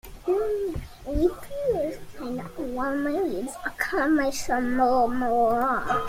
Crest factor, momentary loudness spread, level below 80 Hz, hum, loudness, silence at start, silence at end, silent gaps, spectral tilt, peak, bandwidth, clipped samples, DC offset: 16 dB; 11 LU; -44 dBFS; none; -26 LUFS; 0.05 s; 0 s; none; -5 dB/octave; -10 dBFS; 16.5 kHz; under 0.1%; under 0.1%